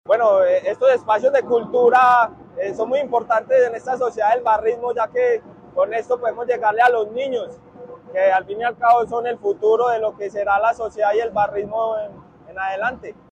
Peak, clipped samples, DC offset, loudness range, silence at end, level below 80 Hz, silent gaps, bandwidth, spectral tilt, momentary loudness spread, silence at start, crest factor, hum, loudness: -4 dBFS; under 0.1%; under 0.1%; 4 LU; 0.2 s; -58 dBFS; none; 8.8 kHz; -5 dB/octave; 10 LU; 0.1 s; 14 dB; none; -19 LUFS